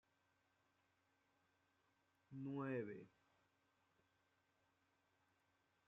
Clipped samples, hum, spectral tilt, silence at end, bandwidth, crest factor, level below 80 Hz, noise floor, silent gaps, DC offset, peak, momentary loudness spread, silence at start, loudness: under 0.1%; none; -7.5 dB/octave; 2.8 s; 6 kHz; 20 dB; under -90 dBFS; -84 dBFS; none; under 0.1%; -36 dBFS; 14 LU; 2.3 s; -50 LUFS